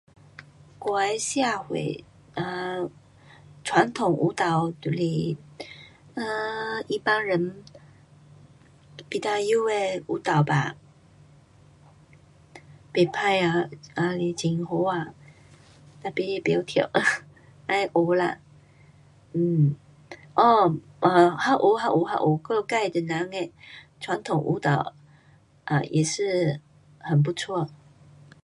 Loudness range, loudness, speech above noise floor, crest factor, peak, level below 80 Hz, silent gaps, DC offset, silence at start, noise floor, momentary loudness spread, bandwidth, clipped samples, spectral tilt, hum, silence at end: 7 LU; -25 LUFS; 33 dB; 22 dB; -4 dBFS; -64 dBFS; none; under 0.1%; 0.4 s; -57 dBFS; 15 LU; 11.5 kHz; under 0.1%; -5.5 dB/octave; none; 0.7 s